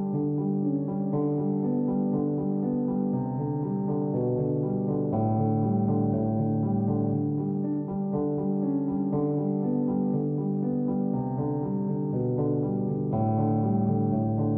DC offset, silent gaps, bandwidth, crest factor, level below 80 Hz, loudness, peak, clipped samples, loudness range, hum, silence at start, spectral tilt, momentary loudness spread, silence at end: under 0.1%; none; 2.4 kHz; 12 dB; -56 dBFS; -27 LUFS; -14 dBFS; under 0.1%; 1 LU; none; 0 s; -15 dB/octave; 3 LU; 0 s